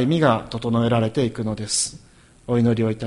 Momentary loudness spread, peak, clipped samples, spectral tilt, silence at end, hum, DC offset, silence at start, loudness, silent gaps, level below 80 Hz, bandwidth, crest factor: 7 LU; -4 dBFS; under 0.1%; -5 dB/octave; 0 s; none; under 0.1%; 0 s; -21 LUFS; none; -50 dBFS; 11.5 kHz; 18 dB